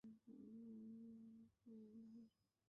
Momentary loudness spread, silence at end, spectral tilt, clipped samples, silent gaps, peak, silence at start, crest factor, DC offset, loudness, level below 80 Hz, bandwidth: 7 LU; 0.4 s; -10 dB/octave; under 0.1%; none; -52 dBFS; 0.05 s; 10 dB; under 0.1%; -62 LUFS; under -90 dBFS; 5.4 kHz